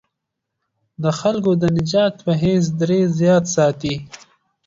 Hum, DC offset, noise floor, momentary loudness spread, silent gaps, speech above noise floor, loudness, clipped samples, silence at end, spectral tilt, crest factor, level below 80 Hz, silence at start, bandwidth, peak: none; under 0.1%; -79 dBFS; 8 LU; none; 62 dB; -18 LUFS; under 0.1%; 0.5 s; -6 dB/octave; 14 dB; -50 dBFS; 1 s; 7.8 kHz; -4 dBFS